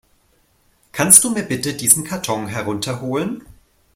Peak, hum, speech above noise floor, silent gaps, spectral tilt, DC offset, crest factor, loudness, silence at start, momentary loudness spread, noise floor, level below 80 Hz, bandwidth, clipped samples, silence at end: 0 dBFS; none; 42 dB; none; -2.5 dB/octave; under 0.1%; 20 dB; -16 LUFS; 0.95 s; 16 LU; -59 dBFS; -52 dBFS; 16.5 kHz; 0.1%; 0.45 s